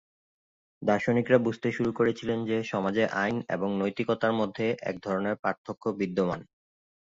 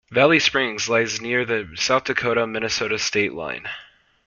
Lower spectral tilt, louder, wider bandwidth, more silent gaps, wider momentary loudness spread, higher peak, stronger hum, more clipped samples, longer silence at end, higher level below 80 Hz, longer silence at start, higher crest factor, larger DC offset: first, -7 dB/octave vs -3 dB/octave; second, -28 LUFS vs -21 LUFS; about the same, 7.8 kHz vs 7.4 kHz; first, 5.39-5.43 s, 5.58-5.64 s vs none; second, 7 LU vs 13 LU; second, -8 dBFS vs -2 dBFS; neither; neither; about the same, 0.55 s vs 0.45 s; second, -64 dBFS vs -56 dBFS; first, 0.8 s vs 0.1 s; about the same, 20 dB vs 20 dB; neither